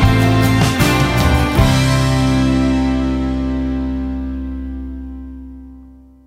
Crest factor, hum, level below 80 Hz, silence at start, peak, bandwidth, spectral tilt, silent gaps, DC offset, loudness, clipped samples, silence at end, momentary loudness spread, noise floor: 14 dB; none; -24 dBFS; 0 s; 0 dBFS; 16 kHz; -6 dB/octave; none; under 0.1%; -15 LUFS; under 0.1%; 0.35 s; 16 LU; -41 dBFS